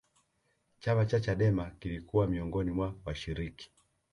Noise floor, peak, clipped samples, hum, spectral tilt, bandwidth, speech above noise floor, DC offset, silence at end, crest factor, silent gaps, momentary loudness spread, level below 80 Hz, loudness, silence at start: -76 dBFS; -16 dBFS; under 0.1%; none; -8 dB/octave; 10.5 kHz; 44 dB; under 0.1%; 0.5 s; 18 dB; none; 12 LU; -48 dBFS; -33 LUFS; 0.8 s